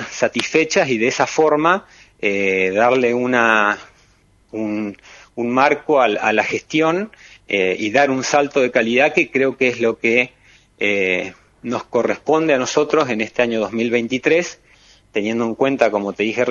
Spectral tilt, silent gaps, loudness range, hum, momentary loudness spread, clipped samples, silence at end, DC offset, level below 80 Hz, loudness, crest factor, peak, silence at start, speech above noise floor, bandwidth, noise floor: -4 dB/octave; none; 3 LU; none; 9 LU; under 0.1%; 0 s; under 0.1%; -58 dBFS; -17 LUFS; 18 dB; 0 dBFS; 0 s; 37 dB; 10 kHz; -55 dBFS